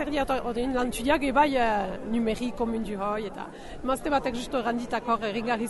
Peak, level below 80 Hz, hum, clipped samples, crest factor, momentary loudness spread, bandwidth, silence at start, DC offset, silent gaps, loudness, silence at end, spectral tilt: -10 dBFS; -44 dBFS; none; under 0.1%; 18 dB; 8 LU; 11.5 kHz; 0 s; under 0.1%; none; -27 LUFS; 0 s; -5 dB/octave